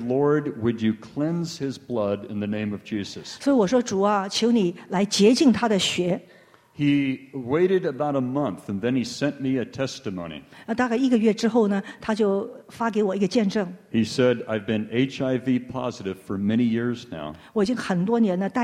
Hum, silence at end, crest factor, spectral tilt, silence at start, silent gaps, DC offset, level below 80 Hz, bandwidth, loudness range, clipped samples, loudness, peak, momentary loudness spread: none; 0 s; 18 dB; -5.5 dB/octave; 0 s; none; under 0.1%; -60 dBFS; 12.5 kHz; 4 LU; under 0.1%; -24 LUFS; -6 dBFS; 10 LU